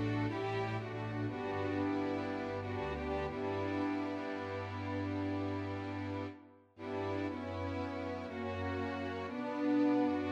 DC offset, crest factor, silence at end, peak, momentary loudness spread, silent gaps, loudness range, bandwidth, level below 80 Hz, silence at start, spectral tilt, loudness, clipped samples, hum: under 0.1%; 14 dB; 0 s; -22 dBFS; 7 LU; none; 3 LU; 7.8 kHz; -60 dBFS; 0 s; -8 dB/octave; -38 LUFS; under 0.1%; none